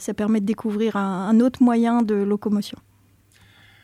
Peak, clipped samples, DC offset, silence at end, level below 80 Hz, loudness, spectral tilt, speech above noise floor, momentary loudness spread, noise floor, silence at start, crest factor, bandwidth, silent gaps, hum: -8 dBFS; under 0.1%; under 0.1%; 1.1 s; -60 dBFS; -21 LUFS; -7 dB/octave; 37 dB; 7 LU; -57 dBFS; 0 s; 14 dB; 13.5 kHz; none; none